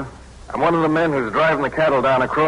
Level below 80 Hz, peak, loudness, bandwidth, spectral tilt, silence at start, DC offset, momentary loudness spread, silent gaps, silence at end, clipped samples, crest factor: -44 dBFS; -6 dBFS; -18 LUFS; 11 kHz; -6.5 dB/octave; 0 s; under 0.1%; 5 LU; none; 0 s; under 0.1%; 12 dB